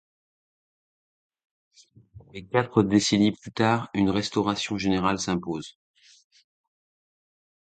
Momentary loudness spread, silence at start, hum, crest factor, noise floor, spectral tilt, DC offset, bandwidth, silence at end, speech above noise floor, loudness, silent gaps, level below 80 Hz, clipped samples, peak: 13 LU; 2.15 s; none; 22 dB; -51 dBFS; -5 dB/octave; under 0.1%; 9.2 kHz; 2 s; 27 dB; -25 LUFS; none; -56 dBFS; under 0.1%; -6 dBFS